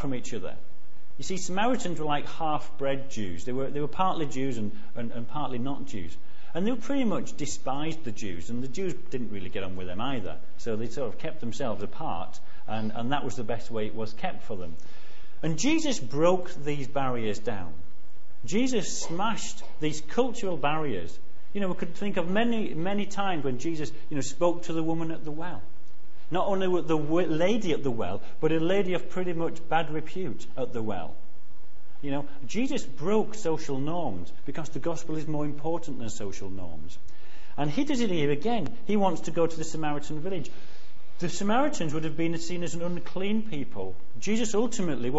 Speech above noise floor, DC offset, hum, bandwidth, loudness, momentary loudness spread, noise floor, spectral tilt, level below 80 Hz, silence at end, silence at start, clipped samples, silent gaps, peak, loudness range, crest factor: 28 dB; 8%; none; 8.2 kHz; -31 LUFS; 12 LU; -58 dBFS; -5.5 dB/octave; -54 dBFS; 0 s; 0 s; under 0.1%; none; -8 dBFS; 6 LU; 22 dB